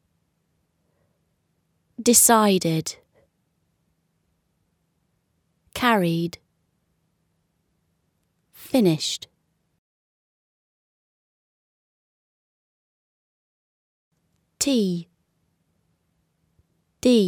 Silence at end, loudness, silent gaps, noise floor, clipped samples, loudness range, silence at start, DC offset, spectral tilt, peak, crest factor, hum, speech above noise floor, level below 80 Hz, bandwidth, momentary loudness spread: 0 s; -20 LUFS; 9.78-14.11 s; -71 dBFS; under 0.1%; 8 LU; 2 s; under 0.1%; -3.5 dB/octave; -2 dBFS; 26 dB; none; 52 dB; -64 dBFS; over 20 kHz; 17 LU